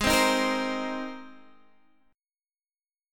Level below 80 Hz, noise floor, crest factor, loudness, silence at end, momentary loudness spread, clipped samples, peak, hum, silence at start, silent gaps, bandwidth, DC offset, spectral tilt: -50 dBFS; under -90 dBFS; 20 dB; -26 LUFS; 1.75 s; 17 LU; under 0.1%; -10 dBFS; none; 0 s; none; 17.5 kHz; under 0.1%; -3 dB/octave